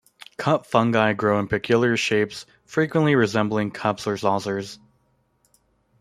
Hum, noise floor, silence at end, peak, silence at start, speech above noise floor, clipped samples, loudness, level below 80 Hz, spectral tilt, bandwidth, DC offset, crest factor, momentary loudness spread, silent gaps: none; -66 dBFS; 1.25 s; -2 dBFS; 0.4 s; 44 dB; under 0.1%; -22 LUFS; -60 dBFS; -6 dB/octave; 14 kHz; under 0.1%; 20 dB; 10 LU; none